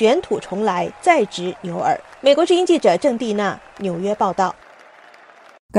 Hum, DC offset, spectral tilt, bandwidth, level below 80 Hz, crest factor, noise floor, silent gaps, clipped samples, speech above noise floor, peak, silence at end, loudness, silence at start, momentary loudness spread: none; under 0.1%; -5 dB/octave; 11.5 kHz; -58 dBFS; 18 dB; -46 dBFS; 5.59-5.69 s; under 0.1%; 28 dB; -2 dBFS; 0 s; -19 LUFS; 0 s; 10 LU